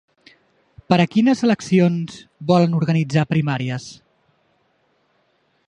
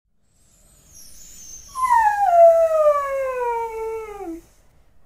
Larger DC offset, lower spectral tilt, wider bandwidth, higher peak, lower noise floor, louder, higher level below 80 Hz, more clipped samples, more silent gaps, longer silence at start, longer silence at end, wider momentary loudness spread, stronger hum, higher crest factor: neither; first, -7 dB/octave vs -3 dB/octave; second, 9.6 kHz vs 16 kHz; first, 0 dBFS vs -4 dBFS; first, -64 dBFS vs -60 dBFS; about the same, -19 LUFS vs -18 LUFS; second, -58 dBFS vs -52 dBFS; neither; neither; about the same, 0.9 s vs 1 s; first, 1.75 s vs 0.65 s; second, 13 LU vs 24 LU; neither; about the same, 20 dB vs 16 dB